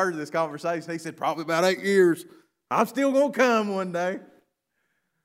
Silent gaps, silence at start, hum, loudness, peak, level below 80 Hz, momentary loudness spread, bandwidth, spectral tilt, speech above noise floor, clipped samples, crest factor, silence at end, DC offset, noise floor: none; 0 s; none; -24 LUFS; -6 dBFS; -80 dBFS; 10 LU; 16 kHz; -5 dB/octave; 51 dB; under 0.1%; 20 dB; 1 s; under 0.1%; -76 dBFS